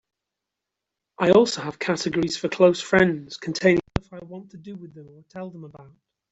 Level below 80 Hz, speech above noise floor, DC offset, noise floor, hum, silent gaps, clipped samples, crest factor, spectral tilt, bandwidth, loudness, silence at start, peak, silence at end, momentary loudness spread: -50 dBFS; 62 dB; under 0.1%; -85 dBFS; none; none; under 0.1%; 22 dB; -5 dB/octave; 8 kHz; -21 LUFS; 1.2 s; -2 dBFS; 0.5 s; 22 LU